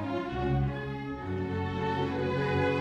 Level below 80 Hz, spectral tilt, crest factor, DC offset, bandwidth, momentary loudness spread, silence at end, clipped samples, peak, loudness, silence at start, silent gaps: -46 dBFS; -8 dB/octave; 14 dB; under 0.1%; 8 kHz; 7 LU; 0 s; under 0.1%; -16 dBFS; -31 LUFS; 0 s; none